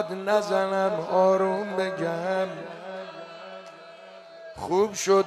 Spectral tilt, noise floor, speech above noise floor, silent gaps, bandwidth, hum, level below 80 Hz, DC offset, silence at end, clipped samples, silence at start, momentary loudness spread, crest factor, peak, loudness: -4.5 dB/octave; -46 dBFS; 21 dB; none; 14 kHz; none; -66 dBFS; under 0.1%; 0 s; under 0.1%; 0 s; 23 LU; 16 dB; -10 dBFS; -25 LUFS